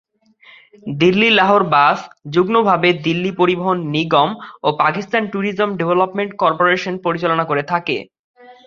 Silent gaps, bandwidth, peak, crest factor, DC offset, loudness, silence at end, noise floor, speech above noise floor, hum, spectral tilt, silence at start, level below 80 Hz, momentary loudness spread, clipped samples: 8.19-8.34 s; 7.2 kHz; 0 dBFS; 16 dB; under 0.1%; -16 LUFS; 0.15 s; -49 dBFS; 32 dB; none; -6.5 dB/octave; 0.85 s; -58 dBFS; 9 LU; under 0.1%